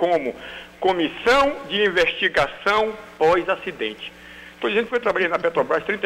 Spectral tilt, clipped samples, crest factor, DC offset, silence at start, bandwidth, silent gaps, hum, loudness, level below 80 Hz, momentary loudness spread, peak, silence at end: -4 dB/octave; under 0.1%; 14 dB; under 0.1%; 0 s; 15.5 kHz; none; 60 Hz at -60 dBFS; -21 LUFS; -50 dBFS; 14 LU; -8 dBFS; 0 s